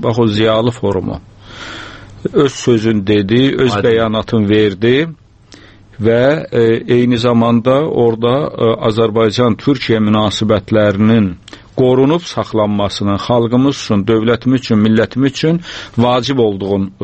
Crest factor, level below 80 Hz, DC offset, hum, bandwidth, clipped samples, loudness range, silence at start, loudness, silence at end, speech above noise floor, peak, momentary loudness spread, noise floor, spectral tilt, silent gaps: 12 dB; -42 dBFS; under 0.1%; none; 8.6 kHz; under 0.1%; 1 LU; 0 s; -13 LUFS; 0 s; 28 dB; 0 dBFS; 7 LU; -41 dBFS; -6.5 dB/octave; none